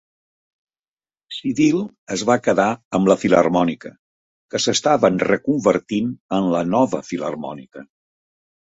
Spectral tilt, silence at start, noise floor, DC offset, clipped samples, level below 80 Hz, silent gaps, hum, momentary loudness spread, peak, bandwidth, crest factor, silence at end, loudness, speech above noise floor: -5 dB/octave; 1.3 s; under -90 dBFS; under 0.1%; under 0.1%; -58 dBFS; 1.98-2.07 s, 2.85-2.91 s, 3.99-4.49 s, 6.20-6.29 s; none; 12 LU; -2 dBFS; 8 kHz; 18 dB; 0.8 s; -19 LUFS; over 71 dB